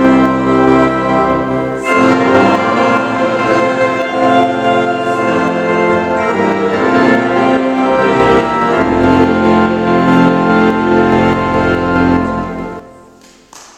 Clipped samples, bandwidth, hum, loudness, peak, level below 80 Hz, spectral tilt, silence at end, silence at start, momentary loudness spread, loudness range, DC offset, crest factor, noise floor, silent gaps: 0.1%; 9.8 kHz; none; -11 LUFS; 0 dBFS; -38 dBFS; -6.5 dB/octave; 0.15 s; 0 s; 4 LU; 2 LU; under 0.1%; 12 dB; -41 dBFS; none